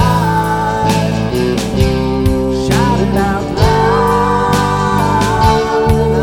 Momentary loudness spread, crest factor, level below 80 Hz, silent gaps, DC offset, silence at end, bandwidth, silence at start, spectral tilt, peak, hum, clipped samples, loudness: 4 LU; 12 dB; -24 dBFS; none; under 0.1%; 0 s; 19 kHz; 0 s; -6 dB/octave; 0 dBFS; none; under 0.1%; -13 LUFS